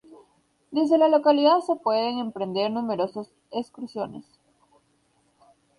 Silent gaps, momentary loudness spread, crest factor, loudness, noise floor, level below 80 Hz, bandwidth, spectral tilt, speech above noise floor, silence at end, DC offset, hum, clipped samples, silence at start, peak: none; 16 LU; 16 dB; -24 LUFS; -67 dBFS; -72 dBFS; 11 kHz; -6.5 dB/octave; 43 dB; 1.55 s; under 0.1%; none; under 0.1%; 0.7 s; -8 dBFS